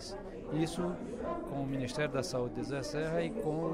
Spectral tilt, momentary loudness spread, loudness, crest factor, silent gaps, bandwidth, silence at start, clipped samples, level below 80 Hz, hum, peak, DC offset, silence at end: -6 dB/octave; 5 LU; -36 LUFS; 16 dB; none; 16 kHz; 0 s; under 0.1%; -52 dBFS; none; -20 dBFS; under 0.1%; 0 s